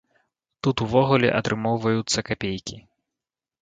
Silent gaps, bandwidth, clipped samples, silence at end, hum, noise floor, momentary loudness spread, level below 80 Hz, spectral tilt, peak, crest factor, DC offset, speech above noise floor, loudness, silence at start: none; 9.4 kHz; under 0.1%; 0.85 s; none; -89 dBFS; 10 LU; -52 dBFS; -5 dB/octave; -4 dBFS; 20 dB; under 0.1%; 66 dB; -23 LUFS; 0.65 s